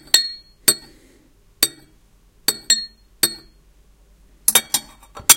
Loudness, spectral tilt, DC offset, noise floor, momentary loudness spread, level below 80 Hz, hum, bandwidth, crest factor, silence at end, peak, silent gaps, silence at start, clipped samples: -19 LUFS; 1 dB/octave; under 0.1%; -53 dBFS; 9 LU; -52 dBFS; none; 17 kHz; 22 dB; 0 s; 0 dBFS; none; 0.15 s; under 0.1%